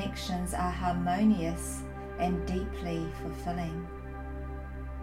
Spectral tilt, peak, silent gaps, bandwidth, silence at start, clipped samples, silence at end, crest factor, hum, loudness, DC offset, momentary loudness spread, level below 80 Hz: -6 dB/octave; -16 dBFS; none; 16 kHz; 0 s; under 0.1%; 0 s; 16 dB; none; -33 LUFS; under 0.1%; 14 LU; -40 dBFS